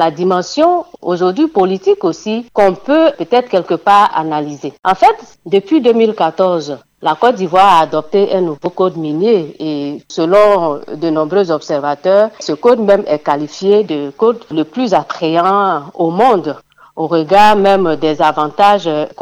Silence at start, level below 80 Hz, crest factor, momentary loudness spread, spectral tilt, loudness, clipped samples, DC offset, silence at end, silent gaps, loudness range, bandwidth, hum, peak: 0 s; -52 dBFS; 12 dB; 10 LU; -6 dB/octave; -13 LUFS; under 0.1%; under 0.1%; 0 s; none; 2 LU; 12.5 kHz; none; 0 dBFS